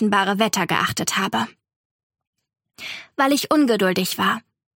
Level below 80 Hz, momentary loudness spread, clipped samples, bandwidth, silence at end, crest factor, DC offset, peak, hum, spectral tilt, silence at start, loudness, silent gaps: -64 dBFS; 13 LU; under 0.1%; 17 kHz; 0.35 s; 18 dB; under 0.1%; -4 dBFS; none; -3.5 dB/octave; 0 s; -20 LUFS; 1.76-2.10 s, 2.27-2.33 s